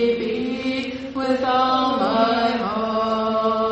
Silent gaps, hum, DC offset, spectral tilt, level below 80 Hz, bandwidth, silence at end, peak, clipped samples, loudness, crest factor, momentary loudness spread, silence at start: none; none; under 0.1%; -5.5 dB/octave; -52 dBFS; 8.4 kHz; 0 s; -6 dBFS; under 0.1%; -21 LUFS; 14 dB; 6 LU; 0 s